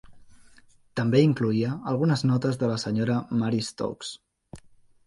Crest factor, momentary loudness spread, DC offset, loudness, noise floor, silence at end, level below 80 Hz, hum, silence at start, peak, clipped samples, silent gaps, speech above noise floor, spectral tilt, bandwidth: 18 dB; 13 LU; under 0.1%; -25 LUFS; -55 dBFS; 0.5 s; -60 dBFS; none; 0.1 s; -8 dBFS; under 0.1%; none; 31 dB; -7 dB/octave; 11.5 kHz